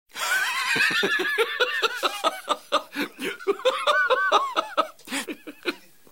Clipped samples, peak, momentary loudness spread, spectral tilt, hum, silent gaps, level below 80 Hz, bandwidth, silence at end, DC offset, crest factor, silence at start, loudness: under 0.1%; -6 dBFS; 11 LU; -1.5 dB/octave; none; none; -74 dBFS; 17 kHz; 0.35 s; 0.2%; 20 dB; 0.15 s; -24 LUFS